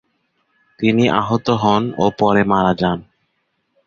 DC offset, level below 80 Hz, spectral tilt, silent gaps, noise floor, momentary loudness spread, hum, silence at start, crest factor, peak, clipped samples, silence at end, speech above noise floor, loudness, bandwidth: under 0.1%; -48 dBFS; -7 dB/octave; none; -69 dBFS; 6 LU; none; 0.8 s; 16 dB; 0 dBFS; under 0.1%; 0.85 s; 53 dB; -17 LUFS; 7.4 kHz